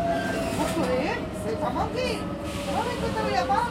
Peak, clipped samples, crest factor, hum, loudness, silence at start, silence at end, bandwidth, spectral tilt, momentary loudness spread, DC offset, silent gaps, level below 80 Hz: -12 dBFS; under 0.1%; 14 dB; none; -27 LUFS; 0 s; 0 s; 16.5 kHz; -5 dB/octave; 6 LU; under 0.1%; none; -44 dBFS